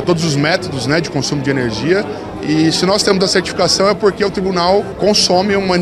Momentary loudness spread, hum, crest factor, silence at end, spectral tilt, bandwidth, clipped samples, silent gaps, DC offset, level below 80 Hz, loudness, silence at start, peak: 5 LU; none; 14 dB; 0 s; -4.5 dB/octave; 14 kHz; under 0.1%; none; under 0.1%; -40 dBFS; -14 LUFS; 0 s; 0 dBFS